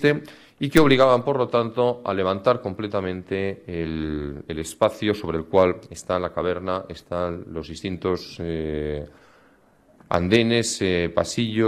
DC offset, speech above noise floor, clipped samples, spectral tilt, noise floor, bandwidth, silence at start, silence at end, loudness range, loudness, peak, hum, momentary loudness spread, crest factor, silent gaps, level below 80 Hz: under 0.1%; 34 dB; under 0.1%; -5.5 dB/octave; -57 dBFS; 16 kHz; 0 s; 0 s; 8 LU; -23 LUFS; 0 dBFS; none; 13 LU; 24 dB; none; -46 dBFS